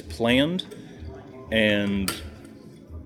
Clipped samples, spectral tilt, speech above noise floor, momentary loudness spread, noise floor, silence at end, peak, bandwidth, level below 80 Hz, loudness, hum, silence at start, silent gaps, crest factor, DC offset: under 0.1%; -5 dB/octave; 22 dB; 22 LU; -45 dBFS; 0 s; -4 dBFS; 19 kHz; -48 dBFS; -23 LUFS; none; 0 s; none; 22 dB; under 0.1%